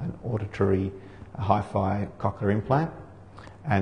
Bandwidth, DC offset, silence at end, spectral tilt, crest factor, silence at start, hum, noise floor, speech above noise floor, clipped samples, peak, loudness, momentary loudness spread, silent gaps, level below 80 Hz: 9.6 kHz; 0.2%; 0 s; -9 dB/octave; 20 dB; 0 s; none; -46 dBFS; 20 dB; under 0.1%; -8 dBFS; -27 LUFS; 20 LU; none; -50 dBFS